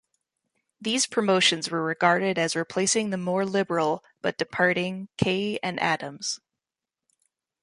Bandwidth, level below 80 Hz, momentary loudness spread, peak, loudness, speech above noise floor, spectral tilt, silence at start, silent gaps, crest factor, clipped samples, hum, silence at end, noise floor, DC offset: 11.5 kHz; -64 dBFS; 9 LU; -6 dBFS; -25 LUFS; 63 dB; -3.5 dB/octave; 0.8 s; none; 20 dB; under 0.1%; none; 1.25 s; -89 dBFS; under 0.1%